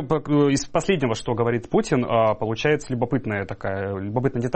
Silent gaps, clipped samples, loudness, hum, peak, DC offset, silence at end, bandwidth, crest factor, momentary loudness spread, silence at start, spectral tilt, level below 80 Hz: none; under 0.1%; -23 LUFS; none; -6 dBFS; under 0.1%; 0 s; 8.8 kHz; 16 dB; 8 LU; 0 s; -6 dB/octave; -48 dBFS